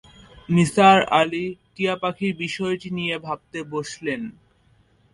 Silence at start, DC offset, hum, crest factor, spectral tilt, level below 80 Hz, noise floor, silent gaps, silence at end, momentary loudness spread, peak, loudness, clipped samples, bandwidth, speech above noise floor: 0.5 s; under 0.1%; none; 20 dB; -5.5 dB/octave; -56 dBFS; -59 dBFS; none; 0.8 s; 16 LU; -2 dBFS; -22 LUFS; under 0.1%; 11.5 kHz; 38 dB